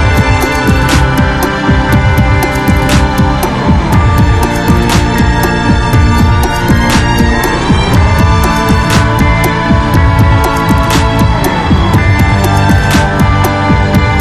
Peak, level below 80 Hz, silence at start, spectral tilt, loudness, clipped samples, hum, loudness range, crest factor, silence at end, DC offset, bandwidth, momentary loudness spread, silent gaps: 0 dBFS; -14 dBFS; 0 s; -6 dB/octave; -9 LUFS; 0.6%; none; 1 LU; 8 dB; 0 s; 1%; 14 kHz; 2 LU; none